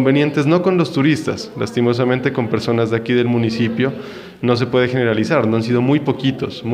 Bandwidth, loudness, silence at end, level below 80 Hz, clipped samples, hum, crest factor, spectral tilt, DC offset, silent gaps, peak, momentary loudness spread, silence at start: 11 kHz; -17 LUFS; 0 s; -54 dBFS; under 0.1%; none; 14 dB; -7 dB/octave; under 0.1%; none; -2 dBFS; 7 LU; 0 s